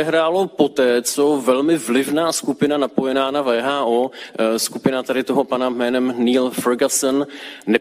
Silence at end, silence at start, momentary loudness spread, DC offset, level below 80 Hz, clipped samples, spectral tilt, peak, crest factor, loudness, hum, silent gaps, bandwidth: 0 s; 0 s; 4 LU; under 0.1%; -64 dBFS; under 0.1%; -3.5 dB/octave; -2 dBFS; 18 dB; -18 LUFS; none; none; 16 kHz